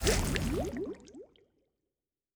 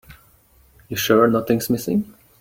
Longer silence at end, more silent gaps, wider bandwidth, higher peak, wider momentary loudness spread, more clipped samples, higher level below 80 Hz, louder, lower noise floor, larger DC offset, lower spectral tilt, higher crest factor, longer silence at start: first, 1.1 s vs 0.3 s; neither; first, over 20 kHz vs 17 kHz; second, -12 dBFS vs -4 dBFS; first, 22 LU vs 12 LU; neither; first, -42 dBFS vs -54 dBFS; second, -34 LUFS vs -19 LUFS; first, under -90 dBFS vs -55 dBFS; neither; about the same, -4 dB/octave vs -5 dB/octave; first, 24 dB vs 18 dB; about the same, 0 s vs 0.1 s